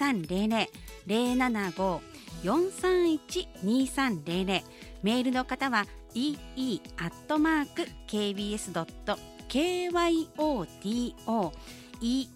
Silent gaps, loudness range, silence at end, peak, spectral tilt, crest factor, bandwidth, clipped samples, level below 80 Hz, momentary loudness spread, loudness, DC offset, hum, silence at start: none; 2 LU; 0 s; -12 dBFS; -4.5 dB/octave; 16 dB; 16 kHz; under 0.1%; -50 dBFS; 9 LU; -30 LUFS; under 0.1%; none; 0 s